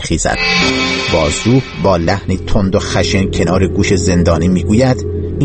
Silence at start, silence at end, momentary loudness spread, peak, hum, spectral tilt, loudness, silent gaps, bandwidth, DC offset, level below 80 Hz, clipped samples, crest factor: 0 s; 0 s; 4 LU; 0 dBFS; none; -5 dB/octave; -13 LUFS; none; 8.8 kHz; under 0.1%; -26 dBFS; under 0.1%; 12 dB